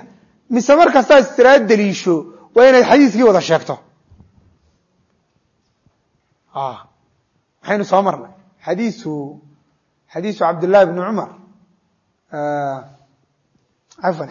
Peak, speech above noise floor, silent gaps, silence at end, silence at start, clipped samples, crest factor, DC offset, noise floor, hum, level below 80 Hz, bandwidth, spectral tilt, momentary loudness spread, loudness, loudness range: 0 dBFS; 51 dB; none; 0 s; 0.5 s; under 0.1%; 16 dB; under 0.1%; -65 dBFS; none; -60 dBFS; 7.4 kHz; -5.5 dB/octave; 20 LU; -14 LUFS; 20 LU